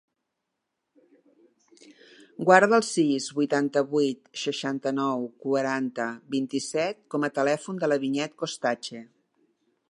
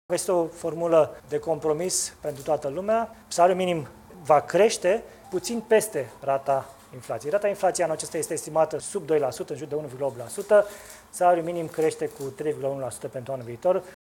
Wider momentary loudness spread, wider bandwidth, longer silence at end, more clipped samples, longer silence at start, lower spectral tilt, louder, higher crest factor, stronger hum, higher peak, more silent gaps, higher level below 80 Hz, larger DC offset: about the same, 11 LU vs 12 LU; second, 11.5 kHz vs 18 kHz; first, 0.85 s vs 0.1 s; neither; first, 2.4 s vs 0.1 s; about the same, -4.5 dB/octave vs -4 dB/octave; about the same, -26 LUFS vs -26 LUFS; first, 26 dB vs 20 dB; neither; first, -2 dBFS vs -6 dBFS; neither; second, -80 dBFS vs -62 dBFS; neither